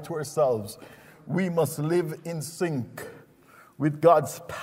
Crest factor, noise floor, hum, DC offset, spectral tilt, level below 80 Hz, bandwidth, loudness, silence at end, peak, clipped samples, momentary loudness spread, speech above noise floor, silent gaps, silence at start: 20 dB; -55 dBFS; none; under 0.1%; -6.5 dB/octave; -66 dBFS; 16 kHz; -26 LUFS; 0 s; -8 dBFS; under 0.1%; 19 LU; 29 dB; none; 0 s